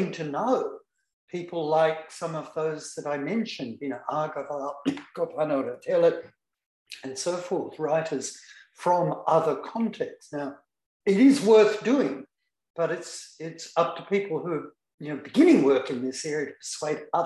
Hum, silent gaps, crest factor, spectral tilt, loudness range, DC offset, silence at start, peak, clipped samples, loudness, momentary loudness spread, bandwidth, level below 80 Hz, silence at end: none; 1.13-1.28 s, 6.66-6.86 s, 10.86-11.00 s, 12.70-12.74 s, 14.94-14.98 s; 18 dB; -5.5 dB/octave; 7 LU; under 0.1%; 0 s; -8 dBFS; under 0.1%; -26 LUFS; 18 LU; 12 kHz; -74 dBFS; 0 s